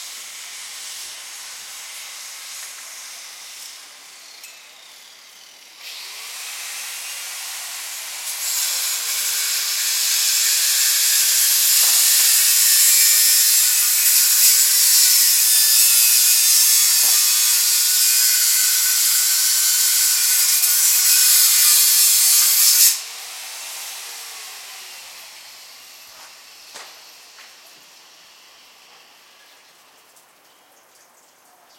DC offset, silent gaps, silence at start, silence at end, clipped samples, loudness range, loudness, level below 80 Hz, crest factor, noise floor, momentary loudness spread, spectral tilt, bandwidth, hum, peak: under 0.1%; none; 0 s; 4.35 s; under 0.1%; 22 LU; -12 LUFS; -86 dBFS; 18 dB; -52 dBFS; 21 LU; 6.5 dB/octave; 16.5 kHz; none; 0 dBFS